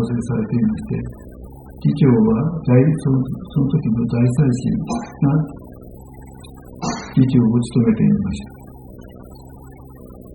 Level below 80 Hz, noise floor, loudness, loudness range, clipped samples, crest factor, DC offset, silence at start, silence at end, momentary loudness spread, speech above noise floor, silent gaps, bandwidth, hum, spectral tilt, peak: -40 dBFS; -38 dBFS; -18 LUFS; 4 LU; under 0.1%; 18 dB; under 0.1%; 0 s; 0 s; 24 LU; 22 dB; none; 16.5 kHz; none; -8.5 dB/octave; -2 dBFS